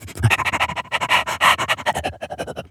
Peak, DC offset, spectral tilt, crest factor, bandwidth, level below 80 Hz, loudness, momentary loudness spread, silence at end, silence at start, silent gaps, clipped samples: 0 dBFS; under 0.1%; -3 dB/octave; 20 dB; 18 kHz; -44 dBFS; -19 LUFS; 14 LU; 0.05 s; 0 s; none; under 0.1%